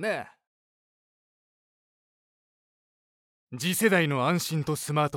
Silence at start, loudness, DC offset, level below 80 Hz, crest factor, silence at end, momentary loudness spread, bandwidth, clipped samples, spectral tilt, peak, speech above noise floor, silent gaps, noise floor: 0 s; -26 LUFS; under 0.1%; -70 dBFS; 22 dB; 0 s; 14 LU; 18 kHz; under 0.1%; -4.5 dB/octave; -8 dBFS; over 64 dB; 0.47-3.47 s; under -90 dBFS